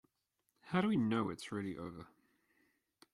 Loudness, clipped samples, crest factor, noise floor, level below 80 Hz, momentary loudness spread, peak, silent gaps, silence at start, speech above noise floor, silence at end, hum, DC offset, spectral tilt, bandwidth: -38 LUFS; under 0.1%; 20 dB; -85 dBFS; -74 dBFS; 15 LU; -20 dBFS; none; 0.65 s; 48 dB; 1.1 s; none; under 0.1%; -6.5 dB/octave; 12 kHz